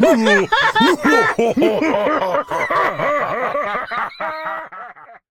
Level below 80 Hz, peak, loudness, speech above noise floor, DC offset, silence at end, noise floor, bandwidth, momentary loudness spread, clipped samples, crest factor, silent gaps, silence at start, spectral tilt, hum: -52 dBFS; 0 dBFS; -17 LUFS; 23 dB; under 0.1%; 0.15 s; -38 dBFS; 17.5 kHz; 13 LU; under 0.1%; 16 dB; none; 0 s; -4.5 dB/octave; none